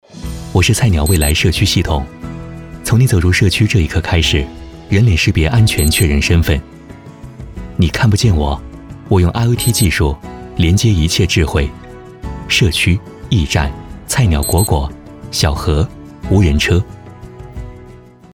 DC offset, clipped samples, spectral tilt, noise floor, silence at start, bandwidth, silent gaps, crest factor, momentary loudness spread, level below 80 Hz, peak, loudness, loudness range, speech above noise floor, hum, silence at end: under 0.1%; under 0.1%; -5 dB/octave; -38 dBFS; 0.15 s; 17 kHz; none; 12 dB; 19 LU; -24 dBFS; -2 dBFS; -14 LUFS; 3 LU; 26 dB; none; 0.4 s